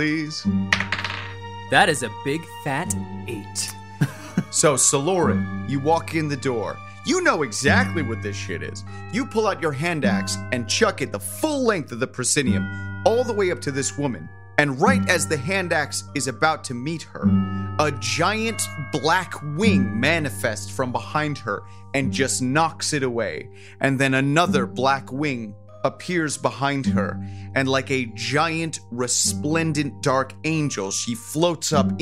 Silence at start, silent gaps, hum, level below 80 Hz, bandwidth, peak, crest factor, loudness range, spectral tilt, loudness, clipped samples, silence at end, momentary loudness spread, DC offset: 0 s; none; none; -56 dBFS; 16 kHz; -2 dBFS; 22 dB; 2 LU; -4 dB/octave; -22 LUFS; under 0.1%; 0 s; 10 LU; 0.5%